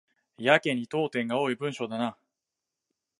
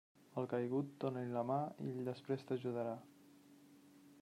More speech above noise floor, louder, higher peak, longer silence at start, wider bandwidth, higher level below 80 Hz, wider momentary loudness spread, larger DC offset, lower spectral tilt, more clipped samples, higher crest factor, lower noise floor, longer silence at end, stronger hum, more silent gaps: first, 60 dB vs 23 dB; first, -28 LUFS vs -42 LUFS; first, -4 dBFS vs -26 dBFS; about the same, 0.4 s vs 0.3 s; second, 11.5 kHz vs 15.5 kHz; first, -80 dBFS vs -90 dBFS; first, 9 LU vs 6 LU; neither; second, -5.5 dB/octave vs -8.5 dB/octave; neither; first, 26 dB vs 16 dB; first, -87 dBFS vs -64 dBFS; first, 1.05 s vs 0 s; neither; neither